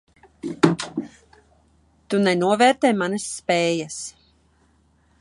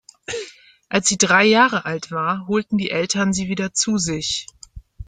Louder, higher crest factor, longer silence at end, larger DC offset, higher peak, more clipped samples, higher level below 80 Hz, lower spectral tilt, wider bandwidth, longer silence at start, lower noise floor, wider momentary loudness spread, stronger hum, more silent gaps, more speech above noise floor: about the same, -21 LUFS vs -19 LUFS; about the same, 20 dB vs 18 dB; first, 1.1 s vs 0.05 s; neither; about the same, -2 dBFS vs -2 dBFS; neither; second, -62 dBFS vs -48 dBFS; first, -4.5 dB/octave vs -3 dB/octave; first, 11.5 kHz vs 9.6 kHz; first, 0.45 s vs 0.3 s; first, -60 dBFS vs -43 dBFS; about the same, 17 LU vs 16 LU; neither; neither; first, 40 dB vs 24 dB